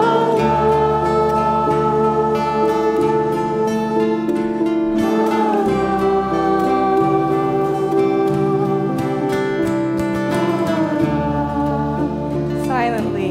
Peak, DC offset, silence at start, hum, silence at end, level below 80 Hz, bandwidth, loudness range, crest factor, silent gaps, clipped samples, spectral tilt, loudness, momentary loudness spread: -4 dBFS; under 0.1%; 0 s; none; 0 s; -40 dBFS; 15.5 kHz; 2 LU; 14 dB; none; under 0.1%; -7.5 dB/octave; -18 LUFS; 4 LU